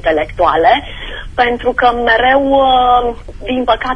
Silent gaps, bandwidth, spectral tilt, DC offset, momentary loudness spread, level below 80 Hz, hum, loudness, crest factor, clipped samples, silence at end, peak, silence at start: none; 9.8 kHz; -5.5 dB/octave; under 0.1%; 12 LU; -30 dBFS; none; -12 LUFS; 12 dB; under 0.1%; 0 s; 0 dBFS; 0 s